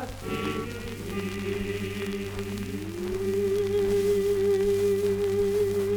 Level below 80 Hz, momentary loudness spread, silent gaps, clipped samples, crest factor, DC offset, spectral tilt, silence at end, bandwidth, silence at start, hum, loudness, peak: -46 dBFS; 9 LU; none; under 0.1%; 12 dB; under 0.1%; -6 dB/octave; 0 s; over 20 kHz; 0 s; none; -28 LUFS; -16 dBFS